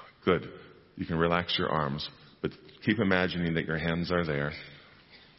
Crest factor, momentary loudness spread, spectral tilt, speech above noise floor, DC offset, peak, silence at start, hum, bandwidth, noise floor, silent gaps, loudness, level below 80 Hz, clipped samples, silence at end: 22 dB; 14 LU; -9 dB/octave; 26 dB; under 0.1%; -8 dBFS; 0 s; none; 6 kHz; -56 dBFS; none; -30 LUFS; -52 dBFS; under 0.1%; 0.2 s